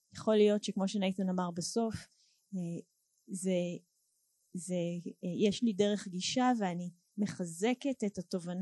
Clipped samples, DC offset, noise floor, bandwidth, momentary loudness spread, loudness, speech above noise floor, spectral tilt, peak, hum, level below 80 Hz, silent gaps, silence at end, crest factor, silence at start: under 0.1%; under 0.1%; -77 dBFS; 12.5 kHz; 14 LU; -34 LUFS; 44 dB; -5.5 dB/octave; -16 dBFS; none; -70 dBFS; none; 0 s; 18 dB; 0.15 s